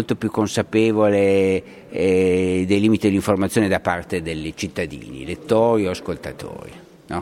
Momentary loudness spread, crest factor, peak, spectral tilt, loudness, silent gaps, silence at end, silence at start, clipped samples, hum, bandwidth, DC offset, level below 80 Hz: 15 LU; 18 dB; -2 dBFS; -6 dB/octave; -20 LUFS; none; 0 s; 0 s; under 0.1%; none; 16 kHz; under 0.1%; -48 dBFS